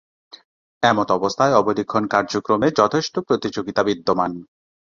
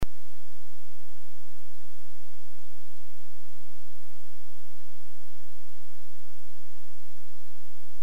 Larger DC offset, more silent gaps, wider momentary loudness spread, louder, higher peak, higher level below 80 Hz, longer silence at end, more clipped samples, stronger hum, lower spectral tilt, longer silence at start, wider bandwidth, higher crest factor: second, under 0.1% vs 20%; neither; first, 6 LU vs 0 LU; first, -20 LUFS vs -55 LUFS; first, -2 dBFS vs -14 dBFS; about the same, -56 dBFS vs -52 dBFS; second, 0.5 s vs 8 s; neither; neither; about the same, -5 dB/octave vs -6 dB/octave; first, 0.8 s vs 0 s; second, 7.4 kHz vs 16 kHz; second, 18 dB vs 26 dB